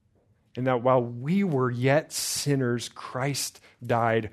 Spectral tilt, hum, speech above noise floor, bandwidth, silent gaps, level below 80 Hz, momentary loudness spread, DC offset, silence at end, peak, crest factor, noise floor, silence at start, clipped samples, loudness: -5 dB/octave; none; 39 dB; 14 kHz; none; -66 dBFS; 9 LU; under 0.1%; 0.05 s; -8 dBFS; 18 dB; -65 dBFS; 0.55 s; under 0.1%; -26 LUFS